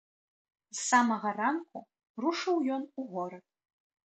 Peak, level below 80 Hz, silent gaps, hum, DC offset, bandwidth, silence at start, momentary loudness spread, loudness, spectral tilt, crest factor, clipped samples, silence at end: -12 dBFS; -82 dBFS; 2.10-2.14 s; none; under 0.1%; 9.2 kHz; 0.75 s; 17 LU; -31 LUFS; -3 dB/octave; 22 dB; under 0.1%; 0.75 s